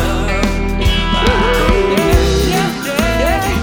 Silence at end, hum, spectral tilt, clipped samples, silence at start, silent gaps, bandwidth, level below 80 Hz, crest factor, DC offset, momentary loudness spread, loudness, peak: 0 s; none; -5 dB/octave; under 0.1%; 0 s; none; 19 kHz; -18 dBFS; 12 dB; under 0.1%; 4 LU; -14 LUFS; 0 dBFS